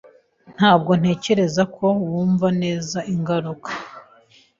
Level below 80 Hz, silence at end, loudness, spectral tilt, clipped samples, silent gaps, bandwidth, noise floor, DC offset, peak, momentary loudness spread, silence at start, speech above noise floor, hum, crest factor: -58 dBFS; 0.6 s; -20 LUFS; -6 dB/octave; under 0.1%; none; 7.6 kHz; -53 dBFS; under 0.1%; -2 dBFS; 13 LU; 0.5 s; 34 dB; none; 20 dB